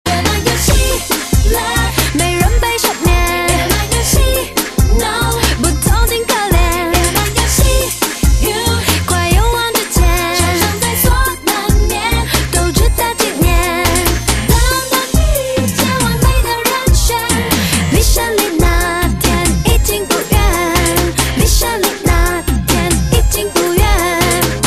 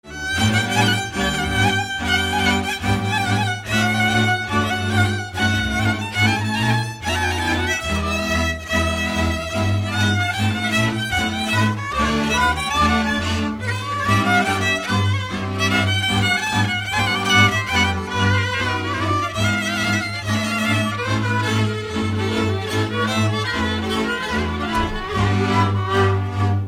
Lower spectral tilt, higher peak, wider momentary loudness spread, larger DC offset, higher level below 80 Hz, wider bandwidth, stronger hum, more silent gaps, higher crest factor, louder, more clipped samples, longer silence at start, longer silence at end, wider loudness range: about the same, -4 dB/octave vs -4.5 dB/octave; about the same, 0 dBFS vs -2 dBFS; second, 2 LU vs 5 LU; neither; first, -16 dBFS vs -36 dBFS; second, 14.5 kHz vs 16 kHz; neither; neither; about the same, 12 dB vs 16 dB; first, -13 LUFS vs -19 LUFS; neither; about the same, 0.05 s vs 0.05 s; about the same, 0 s vs 0 s; second, 0 LU vs 3 LU